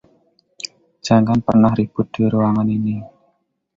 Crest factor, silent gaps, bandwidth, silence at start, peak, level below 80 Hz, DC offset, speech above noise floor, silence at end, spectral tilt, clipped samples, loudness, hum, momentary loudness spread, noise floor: 16 dB; none; 7.8 kHz; 0.65 s; -2 dBFS; -48 dBFS; under 0.1%; 49 dB; 0.7 s; -7.5 dB/octave; under 0.1%; -17 LUFS; none; 17 LU; -65 dBFS